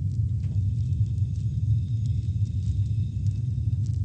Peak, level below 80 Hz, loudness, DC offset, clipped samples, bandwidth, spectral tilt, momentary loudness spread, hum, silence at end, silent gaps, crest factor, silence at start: -14 dBFS; -36 dBFS; -27 LUFS; under 0.1%; under 0.1%; 7.6 kHz; -9 dB/octave; 2 LU; none; 0 s; none; 12 dB; 0 s